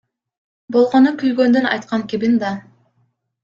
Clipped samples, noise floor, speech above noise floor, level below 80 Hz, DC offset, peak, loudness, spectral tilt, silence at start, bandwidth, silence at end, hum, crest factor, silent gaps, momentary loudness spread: under 0.1%; -64 dBFS; 49 dB; -62 dBFS; under 0.1%; -2 dBFS; -16 LUFS; -6.5 dB/octave; 0.7 s; 7.4 kHz; 0.85 s; none; 16 dB; none; 9 LU